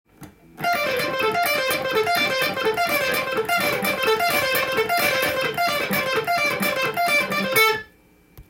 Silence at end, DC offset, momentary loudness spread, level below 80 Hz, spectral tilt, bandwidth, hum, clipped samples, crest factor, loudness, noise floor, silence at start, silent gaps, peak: 0.05 s; under 0.1%; 3 LU; -56 dBFS; -2.5 dB/octave; 17 kHz; none; under 0.1%; 16 dB; -21 LUFS; -55 dBFS; 0.2 s; none; -6 dBFS